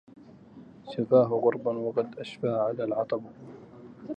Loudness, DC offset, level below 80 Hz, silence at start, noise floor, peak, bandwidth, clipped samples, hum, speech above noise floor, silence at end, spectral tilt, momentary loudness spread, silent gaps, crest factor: -28 LUFS; under 0.1%; -72 dBFS; 0.55 s; -50 dBFS; -8 dBFS; 8.4 kHz; under 0.1%; none; 23 dB; 0 s; -8.5 dB/octave; 25 LU; none; 20 dB